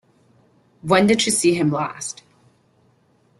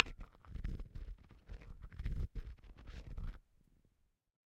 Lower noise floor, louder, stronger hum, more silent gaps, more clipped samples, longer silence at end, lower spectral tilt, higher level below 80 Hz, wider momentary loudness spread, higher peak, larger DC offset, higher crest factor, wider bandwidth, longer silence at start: second, -59 dBFS vs -78 dBFS; first, -19 LUFS vs -48 LUFS; neither; neither; neither; first, 1.3 s vs 1.15 s; second, -4 dB/octave vs -7 dB/octave; second, -58 dBFS vs -48 dBFS; first, 17 LU vs 13 LU; first, -2 dBFS vs -8 dBFS; neither; second, 20 dB vs 38 dB; first, 12.5 kHz vs 7.4 kHz; first, 0.85 s vs 0 s